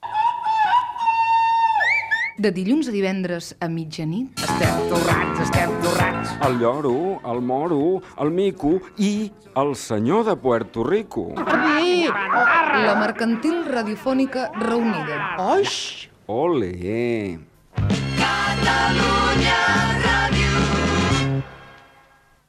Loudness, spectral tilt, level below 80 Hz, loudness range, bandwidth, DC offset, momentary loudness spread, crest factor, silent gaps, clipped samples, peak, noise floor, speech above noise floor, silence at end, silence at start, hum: -20 LUFS; -5 dB/octave; -38 dBFS; 4 LU; 15.5 kHz; under 0.1%; 9 LU; 14 dB; none; under 0.1%; -6 dBFS; -55 dBFS; 34 dB; 0.75 s; 0 s; none